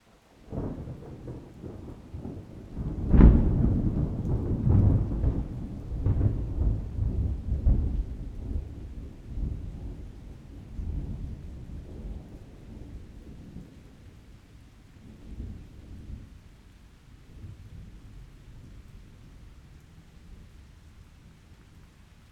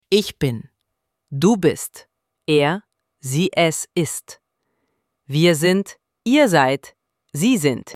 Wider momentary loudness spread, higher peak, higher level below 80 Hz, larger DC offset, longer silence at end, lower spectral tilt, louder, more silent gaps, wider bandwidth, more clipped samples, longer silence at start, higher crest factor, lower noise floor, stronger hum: first, 25 LU vs 17 LU; about the same, -2 dBFS vs -2 dBFS; first, -32 dBFS vs -56 dBFS; neither; first, 0.5 s vs 0 s; first, -10 dB/octave vs -5 dB/octave; second, -29 LUFS vs -19 LUFS; neither; second, 4.9 kHz vs 16 kHz; neither; first, 0.45 s vs 0.1 s; first, 28 dB vs 18 dB; second, -55 dBFS vs -76 dBFS; neither